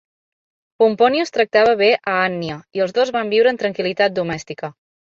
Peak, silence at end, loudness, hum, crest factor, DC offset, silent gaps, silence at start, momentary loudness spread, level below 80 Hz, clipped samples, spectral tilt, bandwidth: -2 dBFS; 0.3 s; -17 LUFS; none; 16 dB; under 0.1%; none; 0.8 s; 12 LU; -60 dBFS; under 0.1%; -5 dB/octave; 7.6 kHz